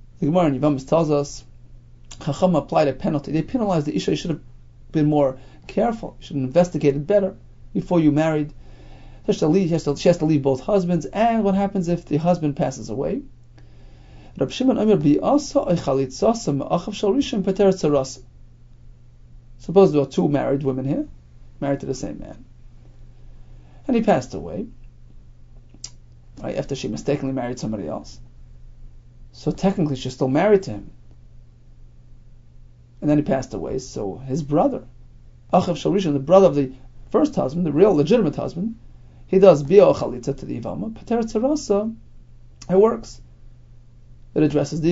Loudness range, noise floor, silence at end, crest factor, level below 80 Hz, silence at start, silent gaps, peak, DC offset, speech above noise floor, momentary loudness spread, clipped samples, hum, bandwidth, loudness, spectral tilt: 8 LU; -45 dBFS; 0 s; 22 dB; -44 dBFS; 0 s; none; 0 dBFS; under 0.1%; 26 dB; 14 LU; under 0.1%; none; 8 kHz; -21 LUFS; -7 dB/octave